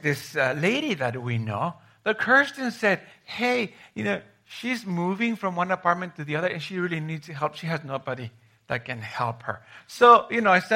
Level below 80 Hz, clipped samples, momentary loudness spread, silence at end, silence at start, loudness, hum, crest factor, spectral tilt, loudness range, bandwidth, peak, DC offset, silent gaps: -70 dBFS; under 0.1%; 14 LU; 0 s; 0.05 s; -25 LUFS; none; 22 dB; -5.5 dB/octave; 7 LU; 16 kHz; -2 dBFS; under 0.1%; none